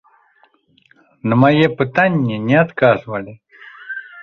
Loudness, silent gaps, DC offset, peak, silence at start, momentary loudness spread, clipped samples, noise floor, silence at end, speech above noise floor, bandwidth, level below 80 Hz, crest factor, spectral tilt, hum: -15 LUFS; none; under 0.1%; -2 dBFS; 1.25 s; 17 LU; under 0.1%; -56 dBFS; 0 s; 41 dB; 6.6 kHz; -56 dBFS; 16 dB; -8.5 dB/octave; none